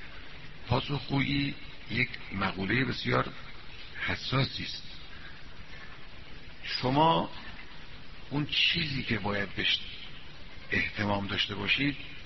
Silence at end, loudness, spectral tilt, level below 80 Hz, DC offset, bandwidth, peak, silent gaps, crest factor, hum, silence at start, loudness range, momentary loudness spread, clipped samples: 0 s; -30 LUFS; -3 dB/octave; -50 dBFS; 0.7%; 6 kHz; -10 dBFS; none; 22 dB; none; 0 s; 5 LU; 22 LU; under 0.1%